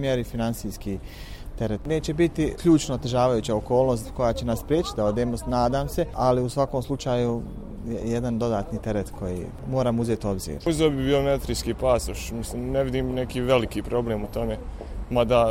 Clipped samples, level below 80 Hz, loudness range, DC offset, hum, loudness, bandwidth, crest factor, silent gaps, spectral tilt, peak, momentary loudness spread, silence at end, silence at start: under 0.1%; -38 dBFS; 4 LU; under 0.1%; none; -25 LUFS; 16.5 kHz; 18 dB; none; -6 dB/octave; -6 dBFS; 10 LU; 0 s; 0 s